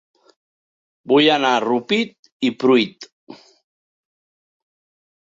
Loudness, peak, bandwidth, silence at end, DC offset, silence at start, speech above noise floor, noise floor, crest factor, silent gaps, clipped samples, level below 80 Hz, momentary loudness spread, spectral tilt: -18 LUFS; -4 dBFS; 7.8 kHz; 1.95 s; under 0.1%; 1.05 s; over 73 dB; under -90 dBFS; 18 dB; 2.19-2.23 s, 2.32-2.40 s, 3.12-3.27 s; under 0.1%; -68 dBFS; 11 LU; -4.5 dB/octave